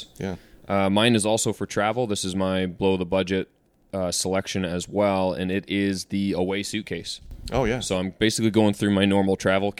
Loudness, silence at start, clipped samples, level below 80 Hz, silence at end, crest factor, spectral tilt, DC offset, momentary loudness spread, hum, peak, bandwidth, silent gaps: -24 LUFS; 0 s; under 0.1%; -48 dBFS; 0.05 s; 18 dB; -4.5 dB/octave; under 0.1%; 11 LU; none; -6 dBFS; 15.5 kHz; none